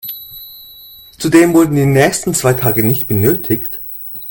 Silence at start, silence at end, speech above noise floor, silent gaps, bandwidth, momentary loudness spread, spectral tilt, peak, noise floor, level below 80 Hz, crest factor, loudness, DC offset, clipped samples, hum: 0.05 s; 0 s; 26 dB; none; 17.5 kHz; 20 LU; -5.5 dB/octave; 0 dBFS; -38 dBFS; -44 dBFS; 14 dB; -13 LUFS; under 0.1%; under 0.1%; none